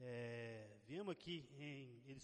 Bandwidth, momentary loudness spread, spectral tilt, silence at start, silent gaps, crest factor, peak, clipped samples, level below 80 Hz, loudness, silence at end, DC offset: 10 kHz; 7 LU; -6 dB/octave; 0 s; none; 16 dB; -36 dBFS; under 0.1%; -82 dBFS; -52 LUFS; 0 s; under 0.1%